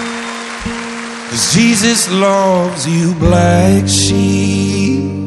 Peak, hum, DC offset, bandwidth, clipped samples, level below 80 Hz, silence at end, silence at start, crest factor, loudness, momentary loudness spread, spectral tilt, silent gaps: 0 dBFS; none; under 0.1%; 13 kHz; under 0.1%; -34 dBFS; 0 s; 0 s; 12 dB; -12 LUFS; 12 LU; -4.5 dB/octave; none